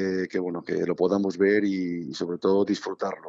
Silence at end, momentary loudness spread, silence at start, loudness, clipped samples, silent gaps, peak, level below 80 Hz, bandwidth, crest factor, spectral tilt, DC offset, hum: 0 s; 9 LU; 0 s; -26 LUFS; under 0.1%; none; -10 dBFS; -72 dBFS; 7.8 kHz; 16 dB; -6.5 dB/octave; under 0.1%; none